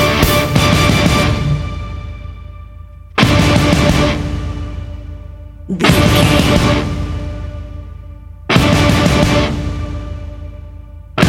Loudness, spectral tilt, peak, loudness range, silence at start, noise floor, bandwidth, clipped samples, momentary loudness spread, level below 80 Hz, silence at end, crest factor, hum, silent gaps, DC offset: -13 LUFS; -5.5 dB/octave; 0 dBFS; 2 LU; 0 s; -33 dBFS; 17 kHz; under 0.1%; 22 LU; -24 dBFS; 0 s; 14 dB; none; none; under 0.1%